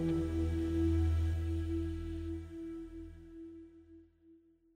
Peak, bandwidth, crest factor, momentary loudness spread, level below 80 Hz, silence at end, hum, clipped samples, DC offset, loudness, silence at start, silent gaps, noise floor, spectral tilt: -22 dBFS; 9.4 kHz; 14 dB; 19 LU; -42 dBFS; 0.4 s; none; under 0.1%; under 0.1%; -36 LUFS; 0 s; none; -64 dBFS; -9 dB/octave